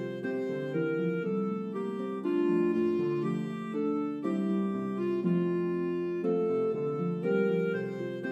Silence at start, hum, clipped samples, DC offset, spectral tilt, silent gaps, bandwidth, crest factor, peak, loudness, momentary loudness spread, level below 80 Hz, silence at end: 0 s; none; under 0.1%; under 0.1%; -9 dB/octave; none; 8.4 kHz; 14 dB; -16 dBFS; -31 LUFS; 6 LU; -80 dBFS; 0 s